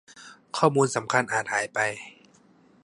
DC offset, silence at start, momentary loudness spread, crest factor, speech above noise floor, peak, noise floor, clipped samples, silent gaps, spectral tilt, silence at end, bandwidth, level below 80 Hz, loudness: under 0.1%; 0.15 s; 14 LU; 22 dB; 33 dB; -4 dBFS; -58 dBFS; under 0.1%; none; -4 dB/octave; 0.75 s; 11.5 kHz; -72 dBFS; -25 LUFS